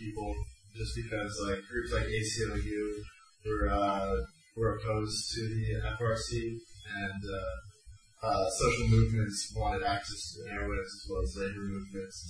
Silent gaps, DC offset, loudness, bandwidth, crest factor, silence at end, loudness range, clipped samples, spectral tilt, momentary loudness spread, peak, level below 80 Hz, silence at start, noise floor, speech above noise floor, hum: none; under 0.1%; -34 LUFS; 10.5 kHz; 20 dB; 0 s; 4 LU; under 0.1%; -5 dB/octave; 12 LU; -14 dBFS; -42 dBFS; 0 s; -56 dBFS; 23 dB; none